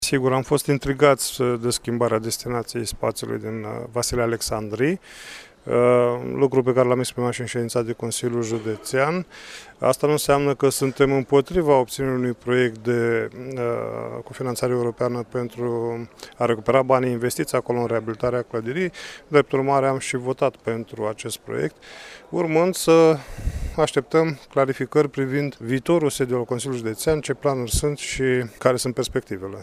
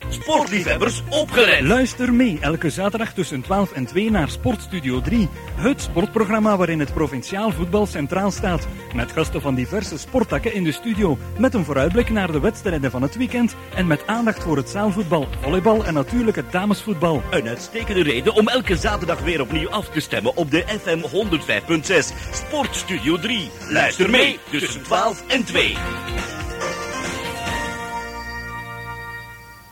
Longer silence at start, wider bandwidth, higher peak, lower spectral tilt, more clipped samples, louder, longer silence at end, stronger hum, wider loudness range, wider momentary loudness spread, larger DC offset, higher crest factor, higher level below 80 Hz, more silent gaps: about the same, 0 s vs 0 s; about the same, 15.5 kHz vs 17 kHz; about the same, 0 dBFS vs -2 dBFS; about the same, -5 dB/octave vs -5 dB/octave; neither; about the same, -22 LUFS vs -20 LUFS; about the same, 0 s vs 0 s; neither; about the same, 4 LU vs 4 LU; about the same, 10 LU vs 9 LU; neither; about the same, 22 dB vs 18 dB; second, -44 dBFS vs -34 dBFS; neither